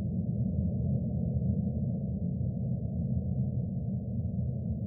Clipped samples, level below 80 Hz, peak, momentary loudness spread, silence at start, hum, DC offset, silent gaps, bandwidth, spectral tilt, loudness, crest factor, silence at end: under 0.1%; -46 dBFS; -18 dBFS; 3 LU; 0 s; none; under 0.1%; none; 0.9 kHz; -16.5 dB/octave; -33 LUFS; 14 dB; 0 s